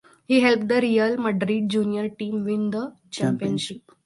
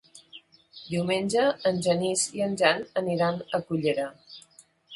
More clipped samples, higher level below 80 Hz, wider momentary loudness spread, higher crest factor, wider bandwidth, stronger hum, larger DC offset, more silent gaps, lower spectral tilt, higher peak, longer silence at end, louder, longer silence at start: neither; about the same, -66 dBFS vs -66 dBFS; second, 9 LU vs 23 LU; about the same, 20 dB vs 22 dB; about the same, 11.5 kHz vs 11.5 kHz; neither; neither; neither; first, -6 dB/octave vs -4 dB/octave; about the same, -4 dBFS vs -6 dBFS; first, 0.25 s vs 0 s; first, -23 LUFS vs -26 LUFS; first, 0.3 s vs 0.15 s